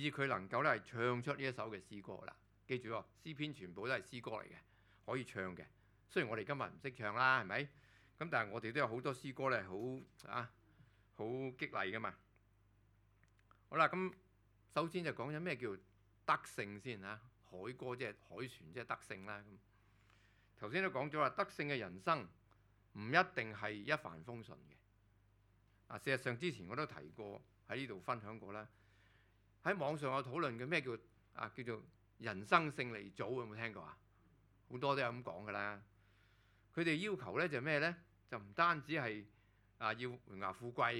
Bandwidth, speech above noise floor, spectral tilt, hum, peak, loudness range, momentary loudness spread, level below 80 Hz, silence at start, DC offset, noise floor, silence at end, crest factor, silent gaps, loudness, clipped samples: 18 kHz; 31 dB; -5.5 dB/octave; none; -14 dBFS; 7 LU; 16 LU; -76 dBFS; 0 s; under 0.1%; -72 dBFS; 0 s; 30 dB; none; -41 LUFS; under 0.1%